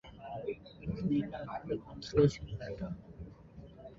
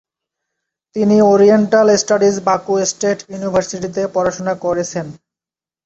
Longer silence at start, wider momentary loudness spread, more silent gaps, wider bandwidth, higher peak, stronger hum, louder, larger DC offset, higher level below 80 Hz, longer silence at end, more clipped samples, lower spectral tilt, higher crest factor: second, 0.05 s vs 0.95 s; first, 22 LU vs 12 LU; neither; about the same, 7.6 kHz vs 8.2 kHz; second, -14 dBFS vs -2 dBFS; neither; second, -36 LUFS vs -15 LUFS; neither; about the same, -54 dBFS vs -54 dBFS; second, 0 s vs 0.7 s; neither; first, -7.5 dB/octave vs -5 dB/octave; first, 24 dB vs 14 dB